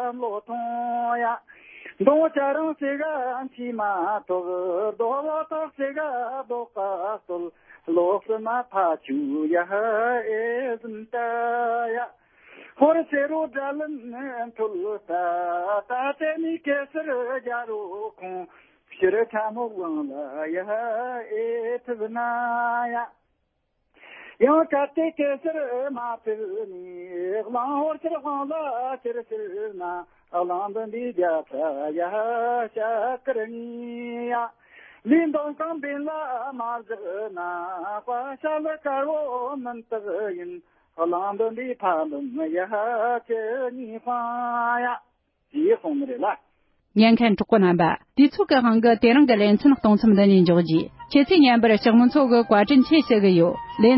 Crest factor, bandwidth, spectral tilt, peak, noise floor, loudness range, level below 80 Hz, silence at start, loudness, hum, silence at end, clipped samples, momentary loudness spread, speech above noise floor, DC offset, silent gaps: 18 dB; 5.8 kHz; -11 dB/octave; -4 dBFS; -73 dBFS; 11 LU; -62 dBFS; 0 s; -24 LUFS; none; 0 s; under 0.1%; 15 LU; 50 dB; under 0.1%; none